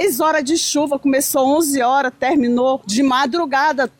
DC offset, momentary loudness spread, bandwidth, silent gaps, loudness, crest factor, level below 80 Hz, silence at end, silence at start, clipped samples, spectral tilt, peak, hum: under 0.1%; 2 LU; 18 kHz; none; -16 LUFS; 10 dB; -56 dBFS; 0.1 s; 0 s; under 0.1%; -2.5 dB/octave; -6 dBFS; none